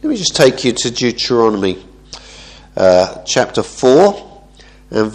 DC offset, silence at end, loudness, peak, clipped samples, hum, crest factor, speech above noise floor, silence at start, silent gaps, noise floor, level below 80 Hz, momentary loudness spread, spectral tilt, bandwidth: under 0.1%; 0 s; -13 LUFS; 0 dBFS; 0.1%; none; 14 dB; 29 dB; 0.05 s; none; -42 dBFS; -44 dBFS; 19 LU; -4 dB/octave; 13 kHz